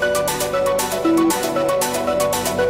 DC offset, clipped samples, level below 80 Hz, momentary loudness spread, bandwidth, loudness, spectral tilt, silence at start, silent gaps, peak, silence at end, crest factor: under 0.1%; under 0.1%; -46 dBFS; 3 LU; 16.5 kHz; -19 LUFS; -3.5 dB/octave; 0 s; none; -6 dBFS; 0 s; 12 dB